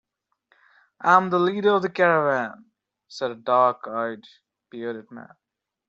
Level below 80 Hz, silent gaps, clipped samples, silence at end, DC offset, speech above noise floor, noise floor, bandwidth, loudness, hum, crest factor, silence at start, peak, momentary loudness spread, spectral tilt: -74 dBFS; none; under 0.1%; 0.65 s; under 0.1%; 45 dB; -68 dBFS; 7.8 kHz; -22 LUFS; none; 22 dB; 1 s; -2 dBFS; 23 LU; -3.5 dB/octave